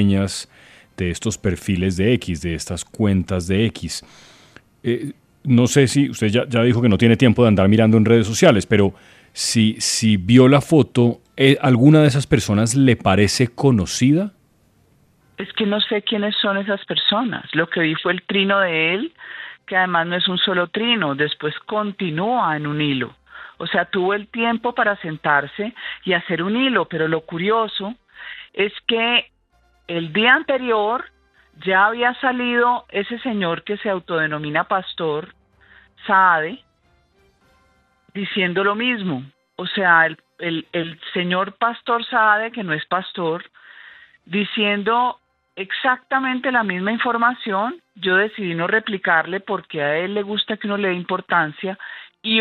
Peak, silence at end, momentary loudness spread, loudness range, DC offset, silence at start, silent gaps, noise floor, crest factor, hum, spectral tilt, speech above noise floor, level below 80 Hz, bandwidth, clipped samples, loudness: 0 dBFS; 0 s; 14 LU; 7 LU; under 0.1%; 0 s; none; -60 dBFS; 18 dB; none; -5 dB/octave; 42 dB; -52 dBFS; 14.5 kHz; under 0.1%; -19 LUFS